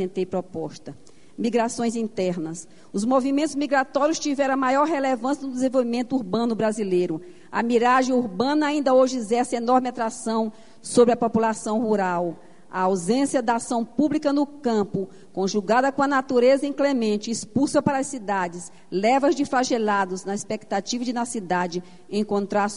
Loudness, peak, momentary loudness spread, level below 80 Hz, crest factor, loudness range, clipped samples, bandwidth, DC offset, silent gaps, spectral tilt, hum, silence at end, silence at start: -23 LUFS; -4 dBFS; 10 LU; -62 dBFS; 18 dB; 3 LU; under 0.1%; 11 kHz; 0.5%; none; -5 dB/octave; none; 0 s; 0 s